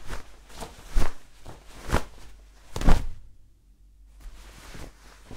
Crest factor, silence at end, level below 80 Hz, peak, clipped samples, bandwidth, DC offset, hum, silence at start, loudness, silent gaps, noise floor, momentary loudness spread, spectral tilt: 20 dB; 0 s; -30 dBFS; -4 dBFS; under 0.1%; 12.5 kHz; under 0.1%; none; 0 s; -32 LUFS; none; -55 dBFS; 24 LU; -5.5 dB/octave